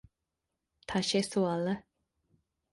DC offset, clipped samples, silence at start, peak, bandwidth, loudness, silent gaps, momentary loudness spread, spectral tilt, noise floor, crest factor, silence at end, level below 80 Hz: under 0.1%; under 0.1%; 0.9 s; -16 dBFS; 11.5 kHz; -32 LUFS; none; 9 LU; -4.5 dB/octave; -86 dBFS; 18 dB; 0.9 s; -66 dBFS